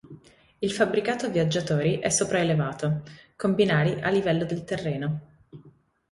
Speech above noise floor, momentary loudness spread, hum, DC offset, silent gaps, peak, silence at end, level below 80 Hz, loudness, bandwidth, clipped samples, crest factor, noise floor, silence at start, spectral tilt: 31 dB; 8 LU; none; under 0.1%; none; -8 dBFS; 0.45 s; -58 dBFS; -25 LUFS; 11.5 kHz; under 0.1%; 18 dB; -56 dBFS; 0.05 s; -5 dB/octave